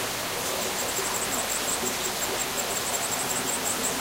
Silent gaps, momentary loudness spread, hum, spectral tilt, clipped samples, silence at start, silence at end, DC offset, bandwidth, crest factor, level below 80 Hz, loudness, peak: none; 2 LU; none; -1 dB/octave; under 0.1%; 0 s; 0 s; under 0.1%; 16 kHz; 14 dB; -54 dBFS; -26 LUFS; -14 dBFS